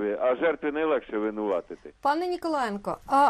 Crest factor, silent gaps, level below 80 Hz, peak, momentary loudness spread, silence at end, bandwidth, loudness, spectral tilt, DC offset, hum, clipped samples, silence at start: 14 dB; none; -58 dBFS; -12 dBFS; 6 LU; 0 s; 14 kHz; -28 LUFS; -5.5 dB/octave; under 0.1%; none; under 0.1%; 0 s